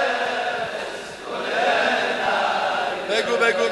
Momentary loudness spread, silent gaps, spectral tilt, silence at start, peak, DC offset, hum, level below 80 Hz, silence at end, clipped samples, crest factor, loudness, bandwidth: 10 LU; none; -2.5 dB/octave; 0 s; -6 dBFS; under 0.1%; none; -62 dBFS; 0 s; under 0.1%; 16 dB; -22 LUFS; 12.5 kHz